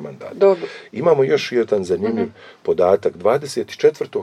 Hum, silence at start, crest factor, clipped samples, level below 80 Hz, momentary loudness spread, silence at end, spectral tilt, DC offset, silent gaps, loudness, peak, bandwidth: none; 0 s; 16 dB; under 0.1%; -62 dBFS; 10 LU; 0 s; -6 dB/octave; under 0.1%; none; -18 LUFS; -2 dBFS; 12.5 kHz